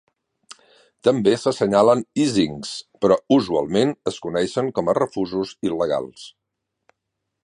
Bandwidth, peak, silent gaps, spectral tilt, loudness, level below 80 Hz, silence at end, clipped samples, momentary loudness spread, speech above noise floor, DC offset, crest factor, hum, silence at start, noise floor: 11 kHz; -2 dBFS; none; -5.5 dB/octave; -21 LUFS; -58 dBFS; 1.15 s; under 0.1%; 9 LU; 59 dB; under 0.1%; 20 dB; none; 1.05 s; -79 dBFS